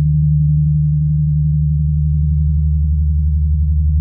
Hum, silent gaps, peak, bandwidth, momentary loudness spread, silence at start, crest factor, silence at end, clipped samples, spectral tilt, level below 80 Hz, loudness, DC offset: none; none; -6 dBFS; 0.3 kHz; 2 LU; 0 s; 6 dB; 0 s; under 0.1%; -30.5 dB/octave; -18 dBFS; -15 LUFS; under 0.1%